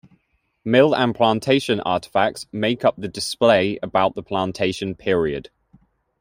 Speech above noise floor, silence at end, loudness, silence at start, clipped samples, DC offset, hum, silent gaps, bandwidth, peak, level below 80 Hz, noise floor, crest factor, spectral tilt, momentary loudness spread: 48 dB; 0.8 s; -20 LUFS; 0.65 s; under 0.1%; under 0.1%; none; none; 16 kHz; -2 dBFS; -54 dBFS; -68 dBFS; 18 dB; -5 dB/octave; 9 LU